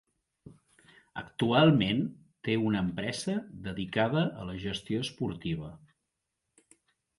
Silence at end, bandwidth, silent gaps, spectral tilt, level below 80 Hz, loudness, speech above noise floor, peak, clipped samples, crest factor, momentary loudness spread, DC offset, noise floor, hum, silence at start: 1.4 s; 11.5 kHz; none; -6 dB/octave; -58 dBFS; -30 LUFS; 55 dB; -10 dBFS; under 0.1%; 22 dB; 16 LU; under 0.1%; -84 dBFS; none; 0.45 s